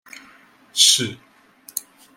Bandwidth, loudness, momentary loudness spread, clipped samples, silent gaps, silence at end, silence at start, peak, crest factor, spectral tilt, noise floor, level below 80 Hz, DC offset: 16.5 kHz; -16 LUFS; 18 LU; under 0.1%; none; 0.35 s; 0.75 s; -2 dBFS; 22 dB; 0 dB/octave; -51 dBFS; -72 dBFS; under 0.1%